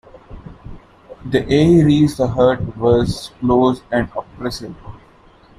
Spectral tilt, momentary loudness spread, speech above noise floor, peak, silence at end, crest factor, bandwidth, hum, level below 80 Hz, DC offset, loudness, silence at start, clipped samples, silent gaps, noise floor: -7 dB/octave; 22 LU; 32 dB; -2 dBFS; 0.65 s; 16 dB; 14 kHz; none; -38 dBFS; under 0.1%; -16 LUFS; 0.3 s; under 0.1%; none; -47 dBFS